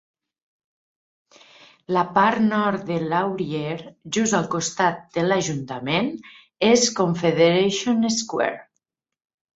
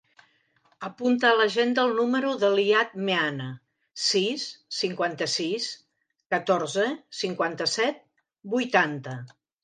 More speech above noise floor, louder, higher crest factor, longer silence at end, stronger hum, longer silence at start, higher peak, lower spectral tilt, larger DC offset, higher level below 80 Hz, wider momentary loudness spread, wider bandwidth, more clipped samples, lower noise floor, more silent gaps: first, 57 dB vs 41 dB; first, -21 LUFS vs -25 LUFS; about the same, 18 dB vs 20 dB; first, 0.95 s vs 0.35 s; neither; first, 1.9 s vs 0.8 s; about the same, -4 dBFS vs -6 dBFS; about the same, -4 dB/octave vs -3.5 dB/octave; neither; first, -62 dBFS vs -80 dBFS; second, 10 LU vs 16 LU; second, 8 kHz vs 9.8 kHz; neither; first, -78 dBFS vs -66 dBFS; neither